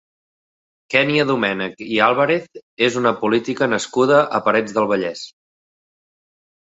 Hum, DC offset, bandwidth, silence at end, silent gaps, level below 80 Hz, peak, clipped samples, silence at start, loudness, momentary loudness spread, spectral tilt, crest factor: none; under 0.1%; 8 kHz; 1.4 s; 2.63-2.77 s; -62 dBFS; -2 dBFS; under 0.1%; 0.9 s; -18 LUFS; 7 LU; -5 dB/octave; 18 dB